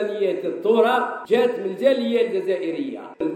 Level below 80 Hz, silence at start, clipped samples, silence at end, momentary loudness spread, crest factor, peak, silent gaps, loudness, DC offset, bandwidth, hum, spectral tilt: -72 dBFS; 0 s; under 0.1%; 0 s; 9 LU; 16 dB; -6 dBFS; none; -21 LUFS; under 0.1%; 14.5 kHz; none; -6 dB/octave